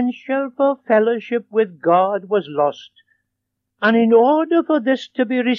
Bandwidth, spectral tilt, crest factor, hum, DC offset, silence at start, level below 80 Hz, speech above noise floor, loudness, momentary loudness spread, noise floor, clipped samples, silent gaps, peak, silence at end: 7 kHz; -7 dB/octave; 16 dB; none; under 0.1%; 0 s; -84 dBFS; 60 dB; -18 LUFS; 8 LU; -77 dBFS; under 0.1%; none; -2 dBFS; 0 s